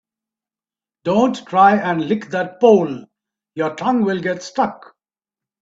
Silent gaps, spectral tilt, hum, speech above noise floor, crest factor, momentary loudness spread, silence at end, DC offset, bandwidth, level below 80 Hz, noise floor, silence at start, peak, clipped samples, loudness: none; -6.5 dB/octave; none; over 73 dB; 18 dB; 12 LU; 0.85 s; under 0.1%; 7.8 kHz; -62 dBFS; under -90 dBFS; 1.05 s; 0 dBFS; under 0.1%; -17 LUFS